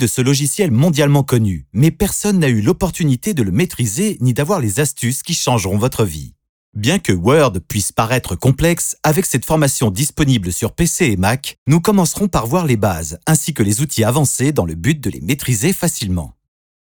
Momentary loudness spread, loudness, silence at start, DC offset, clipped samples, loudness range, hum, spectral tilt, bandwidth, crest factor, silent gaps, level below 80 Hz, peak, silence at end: 6 LU; -16 LUFS; 0 s; 0.2%; under 0.1%; 2 LU; none; -5 dB/octave; over 20 kHz; 16 dB; 6.49-6.73 s, 11.58-11.66 s; -36 dBFS; 0 dBFS; 0.5 s